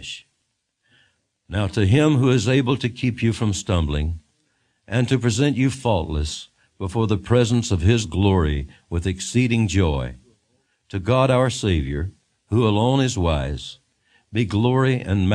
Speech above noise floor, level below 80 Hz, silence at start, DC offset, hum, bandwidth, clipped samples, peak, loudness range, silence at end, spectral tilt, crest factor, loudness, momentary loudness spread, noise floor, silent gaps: 54 dB; -38 dBFS; 0 s; under 0.1%; none; 10.5 kHz; under 0.1%; -4 dBFS; 2 LU; 0 s; -6 dB/octave; 18 dB; -21 LUFS; 11 LU; -73 dBFS; none